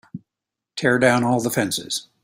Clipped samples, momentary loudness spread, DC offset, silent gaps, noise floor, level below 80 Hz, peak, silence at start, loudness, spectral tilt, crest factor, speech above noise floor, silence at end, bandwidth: under 0.1%; 20 LU; under 0.1%; none; -86 dBFS; -58 dBFS; -2 dBFS; 0.15 s; -20 LUFS; -4 dB/octave; 20 dB; 66 dB; 0.2 s; 16 kHz